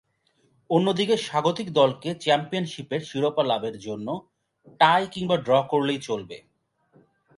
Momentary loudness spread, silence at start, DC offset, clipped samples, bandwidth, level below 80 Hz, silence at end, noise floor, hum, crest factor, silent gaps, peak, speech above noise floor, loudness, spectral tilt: 11 LU; 0.7 s; under 0.1%; under 0.1%; 11.5 kHz; -66 dBFS; 1 s; -67 dBFS; none; 20 dB; none; -4 dBFS; 43 dB; -24 LUFS; -5.5 dB/octave